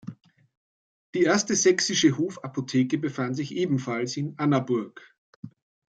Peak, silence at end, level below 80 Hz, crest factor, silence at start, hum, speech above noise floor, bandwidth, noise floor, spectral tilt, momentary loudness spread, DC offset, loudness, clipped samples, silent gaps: -8 dBFS; 0.4 s; -70 dBFS; 18 dB; 0.05 s; none; over 65 dB; 9.2 kHz; under -90 dBFS; -4 dB/octave; 21 LU; under 0.1%; -25 LUFS; under 0.1%; 0.57-1.13 s, 5.18-5.43 s